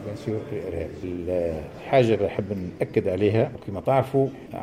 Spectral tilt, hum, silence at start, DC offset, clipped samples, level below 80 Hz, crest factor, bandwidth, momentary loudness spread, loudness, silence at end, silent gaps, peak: -8 dB/octave; none; 0 s; under 0.1%; under 0.1%; -50 dBFS; 18 dB; 14.5 kHz; 11 LU; -25 LUFS; 0 s; none; -8 dBFS